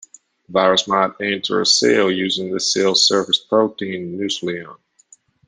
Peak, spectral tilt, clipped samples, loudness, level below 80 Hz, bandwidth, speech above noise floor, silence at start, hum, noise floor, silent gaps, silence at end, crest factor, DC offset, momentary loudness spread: -2 dBFS; -2.5 dB/octave; under 0.1%; -17 LUFS; -64 dBFS; 10 kHz; 35 dB; 0.5 s; none; -53 dBFS; none; 0.7 s; 18 dB; under 0.1%; 11 LU